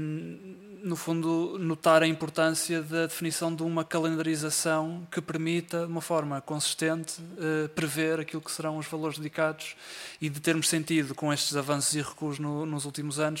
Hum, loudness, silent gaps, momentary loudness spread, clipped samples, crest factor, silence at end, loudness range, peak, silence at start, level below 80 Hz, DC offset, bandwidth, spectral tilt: none; -29 LUFS; none; 9 LU; under 0.1%; 22 dB; 0 s; 4 LU; -8 dBFS; 0 s; -72 dBFS; under 0.1%; 16.5 kHz; -4 dB/octave